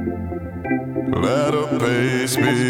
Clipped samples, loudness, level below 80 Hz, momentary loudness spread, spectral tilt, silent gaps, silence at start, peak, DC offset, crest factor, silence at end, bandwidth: under 0.1%; -21 LUFS; -44 dBFS; 9 LU; -5.5 dB/octave; none; 0 s; -4 dBFS; under 0.1%; 16 dB; 0 s; 16.5 kHz